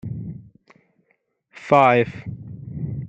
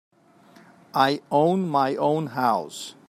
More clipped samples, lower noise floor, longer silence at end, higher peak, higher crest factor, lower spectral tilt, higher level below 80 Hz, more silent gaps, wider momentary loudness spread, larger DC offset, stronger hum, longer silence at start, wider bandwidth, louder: neither; first, -68 dBFS vs -54 dBFS; second, 0 s vs 0.15 s; about the same, -2 dBFS vs -4 dBFS; about the same, 22 dB vs 20 dB; first, -7.5 dB/octave vs -6 dB/octave; first, -54 dBFS vs -74 dBFS; neither; first, 23 LU vs 6 LU; neither; neither; second, 0.05 s vs 0.95 s; second, 8.4 kHz vs 15.5 kHz; first, -19 LUFS vs -23 LUFS